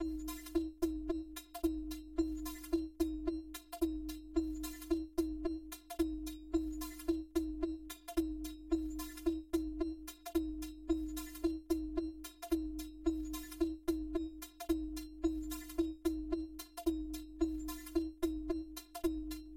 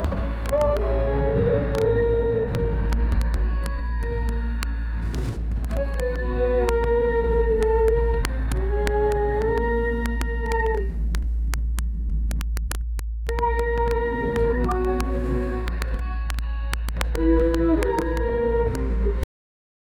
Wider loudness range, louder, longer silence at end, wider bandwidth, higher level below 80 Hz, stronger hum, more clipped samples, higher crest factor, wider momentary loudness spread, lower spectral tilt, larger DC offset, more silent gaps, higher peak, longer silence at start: second, 1 LU vs 4 LU; second, -40 LUFS vs -24 LUFS; second, 0 s vs 0.75 s; first, 16.5 kHz vs 14 kHz; second, -50 dBFS vs -26 dBFS; neither; neither; about the same, 18 dB vs 18 dB; about the same, 7 LU vs 7 LU; second, -5.5 dB/octave vs -7 dB/octave; neither; neither; second, -22 dBFS vs -4 dBFS; about the same, 0 s vs 0 s